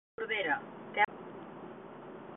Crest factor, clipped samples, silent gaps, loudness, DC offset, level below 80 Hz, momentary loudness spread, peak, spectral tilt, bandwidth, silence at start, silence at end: 22 dB; under 0.1%; none; -33 LUFS; under 0.1%; -76 dBFS; 17 LU; -14 dBFS; -1 dB/octave; 4 kHz; 0.2 s; 0 s